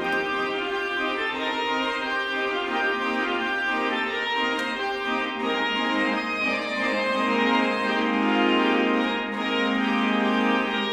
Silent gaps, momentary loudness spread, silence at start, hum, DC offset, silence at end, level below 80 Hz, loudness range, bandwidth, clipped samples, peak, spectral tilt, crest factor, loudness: none; 5 LU; 0 s; none; under 0.1%; 0 s; -60 dBFS; 2 LU; 12.5 kHz; under 0.1%; -10 dBFS; -4.5 dB/octave; 14 dB; -24 LUFS